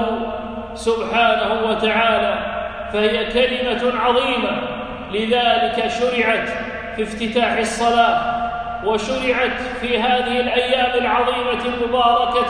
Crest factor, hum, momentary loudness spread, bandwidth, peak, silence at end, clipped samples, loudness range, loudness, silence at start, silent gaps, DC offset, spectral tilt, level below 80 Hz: 16 dB; none; 9 LU; 10.5 kHz; -2 dBFS; 0 s; under 0.1%; 1 LU; -19 LUFS; 0 s; none; under 0.1%; -4 dB/octave; -42 dBFS